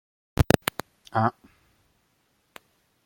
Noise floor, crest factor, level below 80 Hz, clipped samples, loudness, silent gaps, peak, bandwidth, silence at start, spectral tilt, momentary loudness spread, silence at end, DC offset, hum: -70 dBFS; 30 dB; -42 dBFS; under 0.1%; -26 LUFS; none; 0 dBFS; 16.5 kHz; 0.4 s; -5.5 dB/octave; 12 LU; 1.75 s; under 0.1%; none